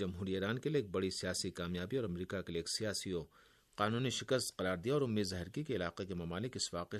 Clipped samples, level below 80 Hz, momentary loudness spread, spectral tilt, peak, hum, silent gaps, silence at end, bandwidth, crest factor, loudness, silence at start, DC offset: under 0.1%; -68 dBFS; 6 LU; -4.5 dB/octave; -18 dBFS; none; none; 0 s; 13.5 kHz; 20 dB; -38 LUFS; 0 s; under 0.1%